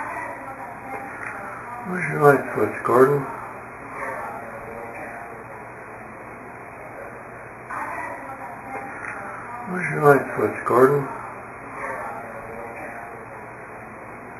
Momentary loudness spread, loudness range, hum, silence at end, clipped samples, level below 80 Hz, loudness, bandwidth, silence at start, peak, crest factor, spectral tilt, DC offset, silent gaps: 21 LU; 13 LU; none; 0 s; under 0.1%; -58 dBFS; -24 LUFS; 13.5 kHz; 0 s; 0 dBFS; 26 dB; -7.5 dB/octave; under 0.1%; none